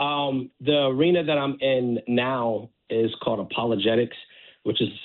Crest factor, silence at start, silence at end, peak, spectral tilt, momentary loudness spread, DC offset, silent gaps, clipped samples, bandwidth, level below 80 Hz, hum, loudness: 14 dB; 0 s; 0 s; -10 dBFS; -9.5 dB/octave; 8 LU; under 0.1%; none; under 0.1%; 4.3 kHz; -64 dBFS; none; -24 LUFS